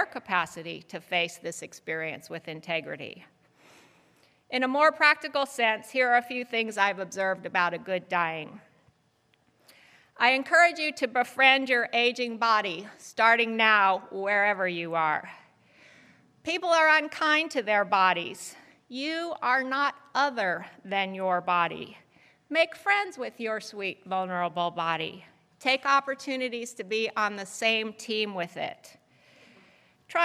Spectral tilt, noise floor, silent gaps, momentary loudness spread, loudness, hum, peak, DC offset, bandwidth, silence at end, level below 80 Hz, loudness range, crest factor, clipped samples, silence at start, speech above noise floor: -3 dB/octave; -68 dBFS; none; 16 LU; -26 LUFS; none; -6 dBFS; under 0.1%; 15.5 kHz; 0 s; -82 dBFS; 7 LU; 22 dB; under 0.1%; 0 s; 41 dB